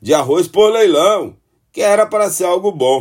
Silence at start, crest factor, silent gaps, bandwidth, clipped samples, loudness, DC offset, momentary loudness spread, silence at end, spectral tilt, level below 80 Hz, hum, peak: 0.05 s; 12 dB; none; 16.5 kHz; under 0.1%; -13 LUFS; under 0.1%; 8 LU; 0 s; -3.5 dB/octave; -58 dBFS; none; 0 dBFS